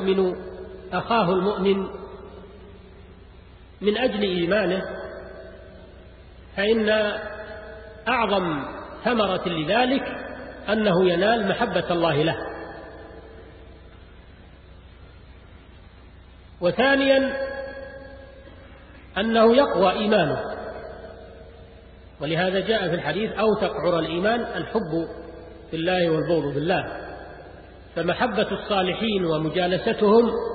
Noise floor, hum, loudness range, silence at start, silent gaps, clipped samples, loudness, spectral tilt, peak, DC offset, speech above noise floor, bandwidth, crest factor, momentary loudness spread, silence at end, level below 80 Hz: -47 dBFS; none; 4 LU; 0 s; none; under 0.1%; -23 LUFS; -10.5 dB/octave; -6 dBFS; under 0.1%; 25 dB; 4.8 kHz; 18 dB; 21 LU; 0 s; -48 dBFS